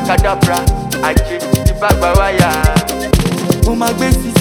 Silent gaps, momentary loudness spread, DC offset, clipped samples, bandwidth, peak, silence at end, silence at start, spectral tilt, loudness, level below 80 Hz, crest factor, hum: none; 4 LU; under 0.1%; under 0.1%; over 20 kHz; 0 dBFS; 0 s; 0 s; -5.5 dB/octave; -13 LUFS; -18 dBFS; 12 dB; none